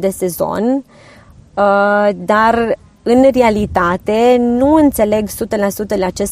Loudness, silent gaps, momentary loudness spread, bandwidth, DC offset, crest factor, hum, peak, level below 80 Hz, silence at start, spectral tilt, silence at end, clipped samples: -13 LUFS; none; 7 LU; 15.5 kHz; under 0.1%; 14 dB; none; 0 dBFS; -38 dBFS; 0 s; -5.5 dB/octave; 0 s; under 0.1%